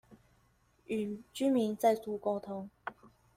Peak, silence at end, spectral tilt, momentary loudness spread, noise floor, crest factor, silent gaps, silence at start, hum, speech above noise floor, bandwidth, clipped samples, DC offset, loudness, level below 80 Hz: -16 dBFS; 0.3 s; -5.5 dB/octave; 15 LU; -70 dBFS; 20 dB; none; 0.1 s; none; 37 dB; 16 kHz; under 0.1%; under 0.1%; -34 LUFS; -72 dBFS